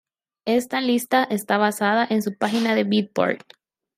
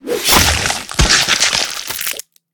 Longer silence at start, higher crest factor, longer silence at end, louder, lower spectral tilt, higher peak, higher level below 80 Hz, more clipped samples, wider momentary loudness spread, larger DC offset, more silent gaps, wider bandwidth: first, 0.45 s vs 0.05 s; about the same, 16 dB vs 16 dB; first, 0.6 s vs 0.35 s; second, -21 LUFS vs -13 LUFS; first, -4.5 dB/octave vs -1.5 dB/octave; second, -6 dBFS vs 0 dBFS; second, -70 dBFS vs -26 dBFS; neither; second, 4 LU vs 10 LU; neither; neither; second, 16 kHz vs over 20 kHz